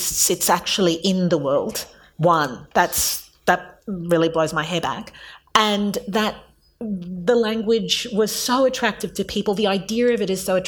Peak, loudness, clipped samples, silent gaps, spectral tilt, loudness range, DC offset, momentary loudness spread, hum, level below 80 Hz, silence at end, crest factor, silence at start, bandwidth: -2 dBFS; -20 LUFS; under 0.1%; none; -3.5 dB/octave; 2 LU; under 0.1%; 11 LU; none; -50 dBFS; 0 s; 20 dB; 0 s; over 20 kHz